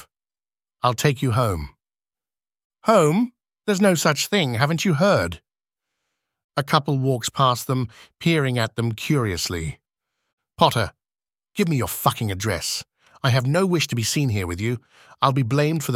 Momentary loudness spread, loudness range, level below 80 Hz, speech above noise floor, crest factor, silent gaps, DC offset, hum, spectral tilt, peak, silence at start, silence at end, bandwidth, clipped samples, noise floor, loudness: 10 LU; 4 LU; -48 dBFS; over 69 dB; 22 dB; 2.65-2.70 s, 6.44-6.49 s, 10.33-10.38 s; under 0.1%; none; -5 dB/octave; -2 dBFS; 0.85 s; 0 s; 16.5 kHz; under 0.1%; under -90 dBFS; -22 LUFS